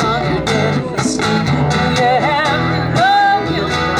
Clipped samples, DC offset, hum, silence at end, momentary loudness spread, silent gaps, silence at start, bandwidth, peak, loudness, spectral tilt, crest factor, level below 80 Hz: under 0.1%; under 0.1%; none; 0 s; 5 LU; none; 0 s; 13 kHz; -4 dBFS; -14 LUFS; -5 dB/octave; 12 dB; -38 dBFS